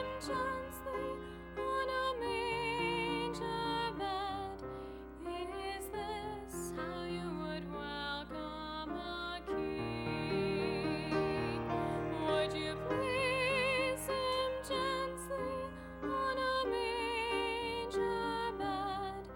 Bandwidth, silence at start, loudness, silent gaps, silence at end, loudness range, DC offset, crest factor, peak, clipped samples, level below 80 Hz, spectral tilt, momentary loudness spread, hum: 16.5 kHz; 0 s; -37 LUFS; none; 0 s; 7 LU; under 0.1%; 18 dB; -20 dBFS; under 0.1%; -56 dBFS; -4.5 dB/octave; 8 LU; none